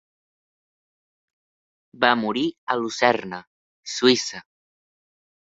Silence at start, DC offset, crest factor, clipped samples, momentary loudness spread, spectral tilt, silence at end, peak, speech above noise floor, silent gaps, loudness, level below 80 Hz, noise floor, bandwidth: 2 s; under 0.1%; 24 dB; under 0.1%; 18 LU; -3 dB/octave; 1 s; -2 dBFS; over 68 dB; 2.58-2.67 s, 3.47-3.83 s; -22 LUFS; -70 dBFS; under -90 dBFS; 8 kHz